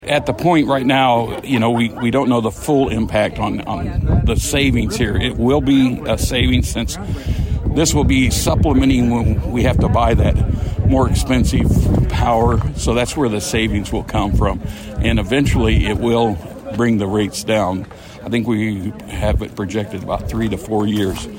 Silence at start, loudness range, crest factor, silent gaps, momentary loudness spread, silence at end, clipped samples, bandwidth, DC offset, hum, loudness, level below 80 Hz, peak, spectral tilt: 0 s; 4 LU; 14 dB; none; 8 LU; 0 s; under 0.1%; 16.5 kHz; under 0.1%; none; -17 LUFS; -24 dBFS; -2 dBFS; -5.5 dB/octave